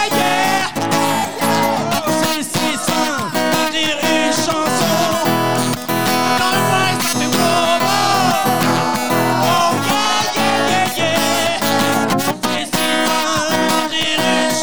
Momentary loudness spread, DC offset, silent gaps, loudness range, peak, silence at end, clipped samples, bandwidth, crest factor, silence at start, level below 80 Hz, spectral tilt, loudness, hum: 3 LU; 2%; none; 2 LU; -2 dBFS; 0 s; under 0.1%; over 20 kHz; 14 dB; 0 s; -52 dBFS; -3 dB/octave; -15 LUFS; none